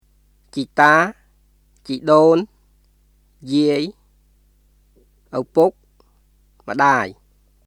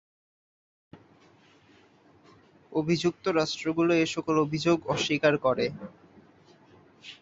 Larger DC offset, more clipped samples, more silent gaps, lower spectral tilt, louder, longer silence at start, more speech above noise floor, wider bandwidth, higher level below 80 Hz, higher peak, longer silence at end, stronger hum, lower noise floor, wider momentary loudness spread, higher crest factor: neither; neither; neither; about the same, -5.5 dB/octave vs -5 dB/octave; first, -17 LUFS vs -27 LUFS; second, 0.55 s vs 0.95 s; first, 41 dB vs 33 dB; first, 13.5 kHz vs 8 kHz; first, -56 dBFS vs -64 dBFS; first, 0 dBFS vs -10 dBFS; first, 0.55 s vs 0.05 s; first, 50 Hz at -55 dBFS vs none; about the same, -57 dBFS vs -59 dBFS; about the same, 16 LU vs 14 LU; about the same, 20 dB vs 20 dB